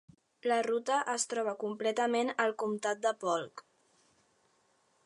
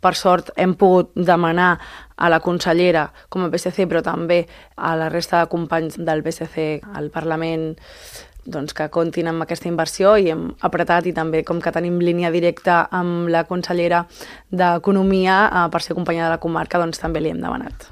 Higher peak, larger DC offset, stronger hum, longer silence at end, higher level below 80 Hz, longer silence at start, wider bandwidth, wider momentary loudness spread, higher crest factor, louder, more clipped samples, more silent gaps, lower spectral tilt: second, -16 dBFS vs 0 dBFS; neither; neither; first, 1.45 s vs 0.05 s; second, -86 dBFS vs -46 dBFS; first, 0.45 s vs 0.05 s; second, 11.5 kHz vs 15 kHz; second, 5 LU vs 11 LU; about the same, 20 dB vs 18 dB; second, -32 LUFS vs -19 LUFS; neither; neither; second, -2.5 dB/octave vs -6 dB/octave